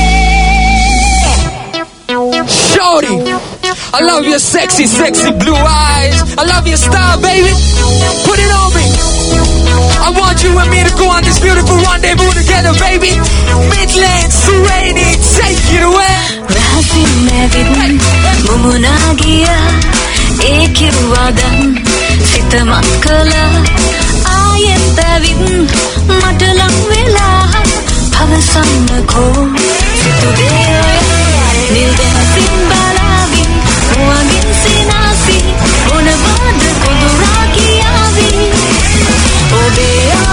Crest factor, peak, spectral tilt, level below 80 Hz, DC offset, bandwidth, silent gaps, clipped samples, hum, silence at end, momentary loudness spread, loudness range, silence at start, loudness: 8 dB; 0 dBFS; -4 dB/octave; -14 dBFS; under 0.1%; 11 kHz; none; 0.8%; none; 0 s; 2 LU; 1 LU; 0 s; -8 LUFS